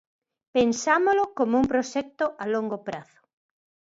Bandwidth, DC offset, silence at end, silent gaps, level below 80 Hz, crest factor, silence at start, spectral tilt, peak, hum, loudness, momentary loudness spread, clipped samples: 8 kHz; under 0.1%; 0.9 s; none; -58 dBFS; 18 dB; 0.55 s; -4.5 dB/octave; -8 dBFS; none; -25 LUFS; 11 LU; under 0.1%